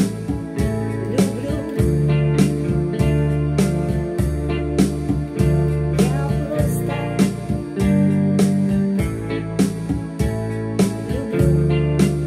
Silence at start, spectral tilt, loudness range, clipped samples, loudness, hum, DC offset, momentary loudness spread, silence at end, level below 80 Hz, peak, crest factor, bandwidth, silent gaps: 0 s; -7.5 dB/octave; 1 LU; under 0.1%; -20 LUFS; none; under 0.1%; 7 LU; 0 s; -30 dBFS; -2 dBFS; 16 dB; 15.5 kHz; none